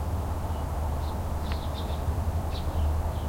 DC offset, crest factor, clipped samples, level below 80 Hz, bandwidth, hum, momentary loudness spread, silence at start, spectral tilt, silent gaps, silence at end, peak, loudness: under 0.1%; 12 dB; under 0.1%; -32 dBFS; 16.5 kHz; none; 3 LU; 0 s; -6.5 dB/octave; none; 0 s; -18 dBFS; -31 LUFS